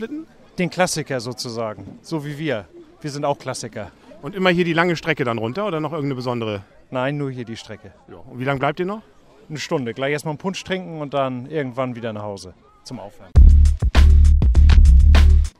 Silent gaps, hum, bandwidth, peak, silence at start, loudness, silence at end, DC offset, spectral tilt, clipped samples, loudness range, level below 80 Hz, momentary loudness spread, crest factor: none; none; 11.5 kHz; -2 dBFS; 0 s; -20 LUFS; 0.1 s; under 0.1%; -6 dB/octave; under 0.1%; 10 LU; -20 dBFS; 21 LU; 16 dB